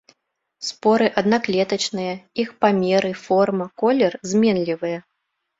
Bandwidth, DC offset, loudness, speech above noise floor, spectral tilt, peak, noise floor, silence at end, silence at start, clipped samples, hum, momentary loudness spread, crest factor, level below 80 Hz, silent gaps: 7.8 kHz; under 0.1%; -20 LUFS; 56 dB; -5 dB/octave; -2 dBFS; -76 dBFS; 0.6 s; 0.6 s; under 0.1%; none; 9 LU; 18 dB; -62 dBFS; none